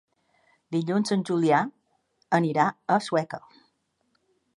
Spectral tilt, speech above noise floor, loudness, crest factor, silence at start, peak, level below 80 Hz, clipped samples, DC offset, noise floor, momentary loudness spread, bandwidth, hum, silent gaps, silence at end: -6 dB/octave; 48 dB; -25 LUFS; 20 dB; 0.7 s; -8 dBFS; -76 dBFS; under 0.1%; under 0.1%; -73 dBFS; 10 LU; 11.5 kHz; none; none; 1.2 s